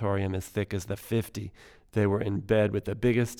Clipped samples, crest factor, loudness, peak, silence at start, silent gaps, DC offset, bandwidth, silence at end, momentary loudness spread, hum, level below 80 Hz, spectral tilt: under 0.1%; 18 dB; -29 LUFS; -12 dBFS; 0 s; none; under 0.1%; 17.5 kHz; 0 s; 10 LU; none; -52 dBFS; -7 dB/octave